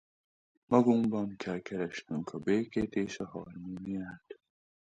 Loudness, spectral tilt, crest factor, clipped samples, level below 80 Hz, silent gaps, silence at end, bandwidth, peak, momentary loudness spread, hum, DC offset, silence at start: -33 LUFS; -7 dB/octave; 22 dB; under 0.1%; -64 dBFS; none; 0.55 s; 8.8 kHz; -12 dBFS; 16 LU; none; under 0.1%; 0.7 s